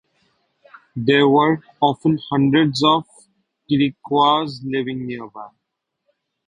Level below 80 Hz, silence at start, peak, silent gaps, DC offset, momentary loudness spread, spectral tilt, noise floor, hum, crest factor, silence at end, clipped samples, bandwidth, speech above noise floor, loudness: -58 dBFS; 0.95 s; -2 dBFS; none; under 0.1%; 14 LU; -6.5 dB/octave; -78 dBFS; none; 18 dB; 1 s; under 0.1%; 10.5 kHz; 60 dB; -18 LUFS